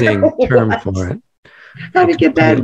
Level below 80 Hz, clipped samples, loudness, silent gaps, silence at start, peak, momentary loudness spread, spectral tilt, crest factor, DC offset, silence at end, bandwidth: -42 dBFS; under 0.1%; -14 LUFS; 1.38-1.43 s; 0 s; 0 dBFS; 13 LU; -7.5 dB/octave; 14 dB; under 0.1%; 0 s; 8.2 kHz